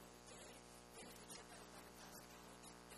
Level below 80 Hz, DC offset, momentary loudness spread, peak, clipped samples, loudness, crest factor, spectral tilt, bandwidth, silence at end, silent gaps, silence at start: -74 dBFS; under 0.1%; 3 LU; -42 dBFS; under 0.1%; -58 LUFS; 16 dB; -2.5 dB/octave; 14.5 kHz; 0 s; none; 0 s